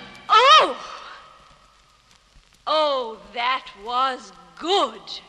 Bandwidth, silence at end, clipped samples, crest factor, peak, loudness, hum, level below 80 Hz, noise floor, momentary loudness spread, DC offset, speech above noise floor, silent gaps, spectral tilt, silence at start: 10.5 kHz; 0.1 s; under 0.1%; 20 dB; -4 dBFS; -19 LUFS; none; -62 dBFS; -56 dBFS; 22 LU; under 0.1%; 32 dB; none; -1 dB/octave; 0 s